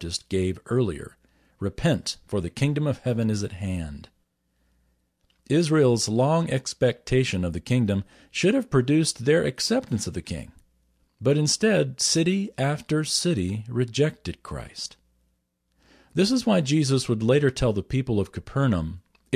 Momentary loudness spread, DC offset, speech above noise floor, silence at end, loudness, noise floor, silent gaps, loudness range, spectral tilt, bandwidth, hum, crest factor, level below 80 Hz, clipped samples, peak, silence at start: 13 LU; under 0.1%; 48 dB; 0 s; -24 LUFS; -72 dBFS; none; 4 LU; -5 dB/octave; 14.5 kHz; none; 16 dB; -46 dBFS; under 0.1%; -8 dBFS; 0 s